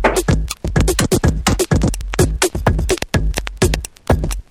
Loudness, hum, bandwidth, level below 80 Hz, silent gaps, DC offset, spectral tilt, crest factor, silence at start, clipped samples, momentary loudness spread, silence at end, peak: -17 LUFS; none; 17.5 kHz; -22 dBFS; none; under 0.1%; -5 dB/octave; 16 dB; 0 s; under 0.1%; 4 LU; 0.1 s; 0 dBFS